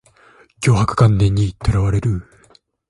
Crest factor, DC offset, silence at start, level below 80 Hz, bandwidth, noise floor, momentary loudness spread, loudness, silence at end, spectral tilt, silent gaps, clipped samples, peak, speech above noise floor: 18 dB; under 0.1%; 0.6 s; -32 dBFS; 11.5 kHz; -53 dBFS; 8 LU; -17 LUFS; 0.7 s; -7 dB/octave; none; under 0.1%; 0 dBFS; 38 dB